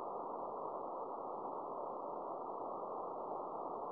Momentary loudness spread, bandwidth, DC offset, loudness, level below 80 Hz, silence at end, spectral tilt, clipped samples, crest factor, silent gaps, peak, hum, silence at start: 1 LU; 5.2 kHz; under 0.1%; -44 LUFS; -84 dBFS; 0 s; -8.5 dB/octave; under 0.1%; 14 dB; none; -30 dBFS; none; 0 s